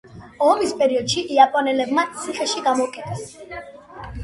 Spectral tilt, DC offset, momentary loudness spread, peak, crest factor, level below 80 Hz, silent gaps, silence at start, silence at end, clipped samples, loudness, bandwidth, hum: -3.5 dB/octave; under 0.1%; 20 LU; 0 dBFS; 20 dB; -48 dBFS; none; 0.1 s; 0 s; under 0.1%; -19 LUFS; 11.5 kHz; none